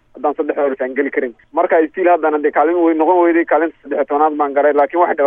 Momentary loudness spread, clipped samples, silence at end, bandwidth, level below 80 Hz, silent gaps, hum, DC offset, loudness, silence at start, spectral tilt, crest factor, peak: 7 LU; under 0.1%; 0 s; 3.6 kHz; -62 dBFS; none; none; under 0.1%; -15 LUFS; 0.15 s; -8 dB/octave; 14 dB; -2 dBFS